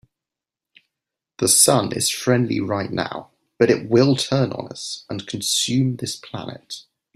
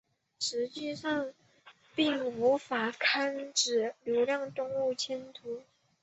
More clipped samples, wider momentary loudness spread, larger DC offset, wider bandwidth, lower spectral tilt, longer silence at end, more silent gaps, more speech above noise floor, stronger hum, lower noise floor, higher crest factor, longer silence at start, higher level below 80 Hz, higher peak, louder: neither; first, 18 LU vs 12 LU; neither; first, 16 kHz vs 8.2 kHz; first, -4 dB/octave vs -2 dB/octave; about the same, 0.35 s vs 0.4 s; neither; first, 67 dB vs 29 dB; neither; first, -88 dBFS vs -60 dBFS; about the same, 20 dB vs 18 dB; first, 1.4 s vs 0.4 s; first, -60 dBFS vs -78 dBFS; first, -2 dBFS vs -14 dBFS; first, -19 LUFS vs -31 LUFS